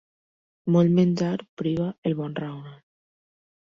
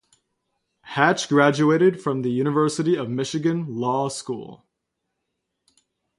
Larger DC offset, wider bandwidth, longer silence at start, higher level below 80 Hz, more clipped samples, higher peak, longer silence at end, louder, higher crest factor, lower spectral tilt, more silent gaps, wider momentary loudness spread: neither; second, 7 kHz vs 11.5 kHz; second, 0.65 s vs 0.85 s; first, -62 dBFS vs -68 dBFS; neither; second, -10 dBFS vs -2 dBFS; second, 0.95 s vs 1.6 s; second, -24 LUFS vs -21 LUFS; second, 16 dB vs 22 dB; first, -8.5 dB/octave vs -5.5 dB/octave; first, 1.49-1.57 s, 1.98-2.02 s vs none; first, 15 LU vs 11 LU